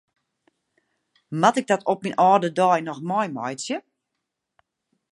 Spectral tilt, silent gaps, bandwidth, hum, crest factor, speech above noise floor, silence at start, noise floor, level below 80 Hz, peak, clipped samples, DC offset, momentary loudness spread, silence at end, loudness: -5 dB/octave; none; 11.5 kHz; none; 22 dB; 60 dB; 1.3 s; -81 dBFS; -78 dBFS; -2 dBFS; under 0.1%; under 0.1%; 12 LU; 1.35 s; -22 LUFS